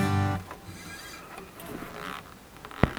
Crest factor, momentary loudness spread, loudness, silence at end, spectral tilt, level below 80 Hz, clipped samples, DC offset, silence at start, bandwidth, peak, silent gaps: 32 dB; 15 LU; -35 LUFS; 0 s; -6 dB/octave; -46 dBFS; under 0.1%; under 0.1%; 0 s; over 20 kHz; 0 dBFS; none